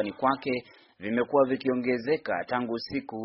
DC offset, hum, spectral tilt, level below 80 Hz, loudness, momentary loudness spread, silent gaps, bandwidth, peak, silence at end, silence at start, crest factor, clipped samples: under 0.1%; none; -4 dB/octave; -64 dBFS; -28 LUFS; 9 LU; none; 6 kHz; -10 dBFS; 0 s; 0 s; 18 dB; under 0.1%